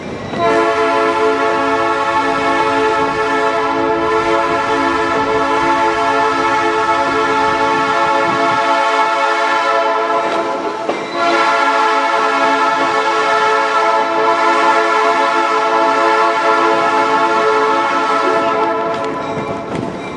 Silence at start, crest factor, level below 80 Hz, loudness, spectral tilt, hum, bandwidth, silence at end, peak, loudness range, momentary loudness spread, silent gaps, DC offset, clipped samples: 0 s; 12 dB; -50 dBFS; -14 LUFS; -4 dB/octave; none; 11 kHz; 0 s; -2 dBFS; 2 LU; 5 LU; none; under 0.1%; under 0.1%